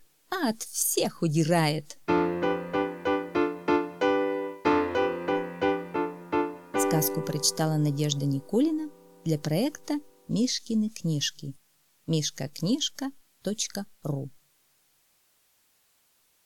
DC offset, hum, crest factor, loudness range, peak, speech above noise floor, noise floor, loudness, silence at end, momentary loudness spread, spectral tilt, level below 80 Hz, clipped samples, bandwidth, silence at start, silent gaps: under 0.1%; none; 18 dB; 5 LU; -10 dBFS; 40 dB; -67 dBFS; -28 LUFS; 2.15 s; 9 LU; -4.5 dB/octave; -64 dBFS; under 0.1%; 18 kHz; 0.3 s; none